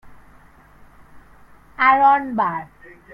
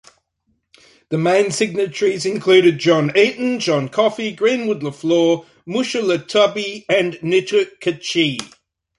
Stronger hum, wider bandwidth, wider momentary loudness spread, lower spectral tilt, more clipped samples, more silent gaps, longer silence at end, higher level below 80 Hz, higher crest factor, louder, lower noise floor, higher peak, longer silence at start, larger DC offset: neither; second, 5.4 kHz vs 11.5 kHz; first, 17 LU vs 9 LU; first, -6.5 dB/octave vs -4.5 dB/octave; neither; neither; about the same, 0.5 s vs 0.55 s; first, -54 dBFS vs -64 dBFS; about the same, 18 dB vs 16 dB; about the same, -17 LUFS vs -17 LUFS; second, -48 dBFS vs -68 dBFS; about the same, -2 dBFS vs -2 dBFS; second, 0.05 s vs 1.1 s; neither